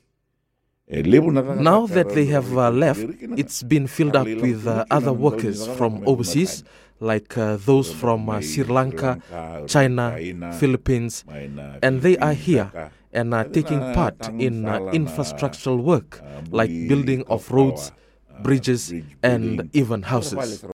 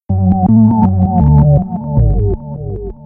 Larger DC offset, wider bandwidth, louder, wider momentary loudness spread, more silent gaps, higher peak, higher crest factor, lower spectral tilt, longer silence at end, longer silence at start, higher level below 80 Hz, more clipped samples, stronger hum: neither; first, 16.5 kHz vs 2.1 kHz; second, -21 LUFS vs -11 LUFS; about the same, 12 LU vs 13 LU; neither; about the same, 0 dBFS vs 0 dBFS; first, 20 dB vs 10 dB; second, -6.5 dB/octave vs -14.5 dB/octave; about the same, 0 s vs 0 s; first, 0.9 s vs 0.1 s; second, -46 dBFS vs -20 dBFS; neither; neither